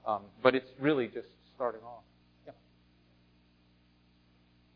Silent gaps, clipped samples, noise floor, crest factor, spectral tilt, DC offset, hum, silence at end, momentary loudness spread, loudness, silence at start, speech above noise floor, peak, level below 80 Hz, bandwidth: none; under 0.1%; -66 dBFS; 28 dB; -4 dB/octave; under 0.1%; 60 Hz at -65 dBFS; 2.25 s; 27 LU; -32 LUFS; 0.05 s; 34 dB; -8 dBFS; -72 dBFS; 5.2 kHz